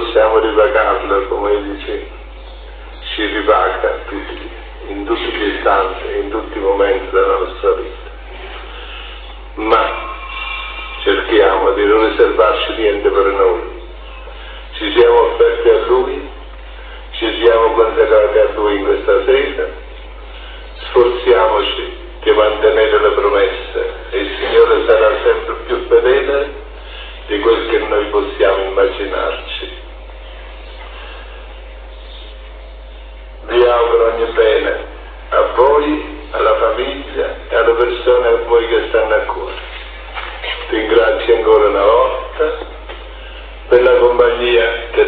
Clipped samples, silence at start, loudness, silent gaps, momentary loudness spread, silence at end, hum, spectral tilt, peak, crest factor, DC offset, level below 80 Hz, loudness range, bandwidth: under 0.1%; 0 s; -14 LUFS; none; 22 LU; 0 s; none; -8 dB/octave; 0 dBFS; 14 dB; under 0.1%; -32 dBFS; 6 LU; 4.7 kHz